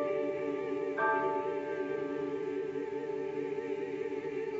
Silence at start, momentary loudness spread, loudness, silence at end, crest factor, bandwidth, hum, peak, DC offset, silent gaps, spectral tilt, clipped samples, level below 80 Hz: 0 s; 6 LU; -35 LUFS; 0 s; 16 dB; 7.6 kHz; none; -20 dBFS; under 0.1%; none; -4.5 dB/octave; under 0.1%; -74 dBFS